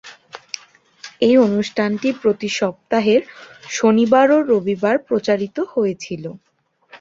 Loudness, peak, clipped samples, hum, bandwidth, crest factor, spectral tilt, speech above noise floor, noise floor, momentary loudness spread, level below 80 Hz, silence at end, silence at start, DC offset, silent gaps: -17 LUFS; -2 dBFS; under 0.1%; none; 7.8 kHz; 16 dB; -5 dB/octave; 31 dB; -48 dBFS; 19 LU; -62 dBFS; 0.05 s; 0.05 s; under 0.1%; none